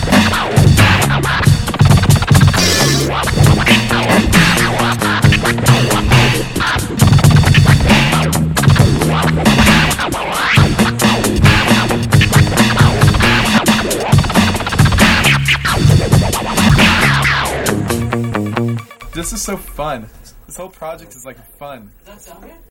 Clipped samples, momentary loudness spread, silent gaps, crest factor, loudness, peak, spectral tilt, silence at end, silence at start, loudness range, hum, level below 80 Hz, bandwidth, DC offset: under 0.1%; 10 LU; none; 12 dB; -11 LUFS; 0 dBFS; -4.5 dB/octave; 0.35 s; 0 s; 10 LU; none; -24 dBFS; 16.5 kHz; under 0.1%